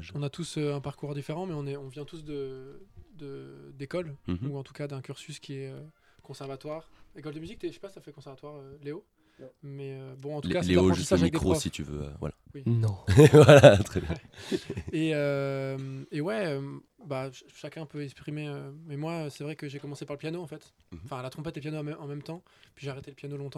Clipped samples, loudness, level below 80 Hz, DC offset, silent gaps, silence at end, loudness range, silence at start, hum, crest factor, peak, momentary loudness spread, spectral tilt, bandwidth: under 0.1%; -27 LUFS; -56 dBFS; under 0.1%; none; 0.05 s; 21 LU; 0 s; none; 28 dB; 0 dBFS; 20 LU; -6.5 dB/octave; 14.5 kHz